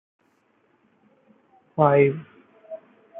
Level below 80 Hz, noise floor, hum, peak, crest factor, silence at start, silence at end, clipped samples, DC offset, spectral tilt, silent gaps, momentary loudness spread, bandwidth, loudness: -70 dBFS; -65 dBFS; none; -4 dBFS; 22 dB; 1.75 s; 0 s; under 0.1%; under 0.1%; -11.5 dB/octave; none; 24 LU; 3.8 kHz; -20 LUFS